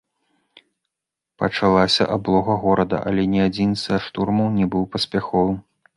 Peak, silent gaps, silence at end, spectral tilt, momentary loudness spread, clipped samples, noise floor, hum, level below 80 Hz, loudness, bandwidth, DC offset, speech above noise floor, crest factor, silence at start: -2 dBFS; none; 0.35 s; -6.5 dB/octave; 6 LU; under 0.1%; -85 dBFS; none; -46 dBFS; -20 LUFS; 11.5 kHz; under 0.1%; 65 dB; 18 dB; 1.4 s